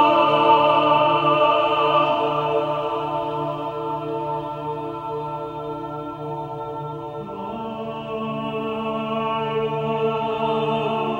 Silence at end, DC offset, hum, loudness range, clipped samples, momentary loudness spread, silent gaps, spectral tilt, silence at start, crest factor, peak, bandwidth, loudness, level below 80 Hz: 0 s; under 0.1%; none; 11 LU; under 0.1%; 14 LU; none; -7 dB/octave; 0 s; 18 dB; -4 dBFS; 15.5 kHz; -22 LUFS; -56 dBFS